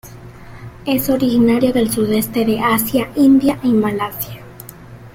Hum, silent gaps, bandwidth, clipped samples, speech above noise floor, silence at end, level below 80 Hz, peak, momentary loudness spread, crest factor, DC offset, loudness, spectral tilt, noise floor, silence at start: none; none; 16.5 kHz; under 0.1%; 22 dB; 0.05 s; -42 dBFS; -2 dBFS; 22 LU; 14 dB; under 0.1%; -15 LUFS; -5.5 dB/octave; -37 dBFS; 0.05 s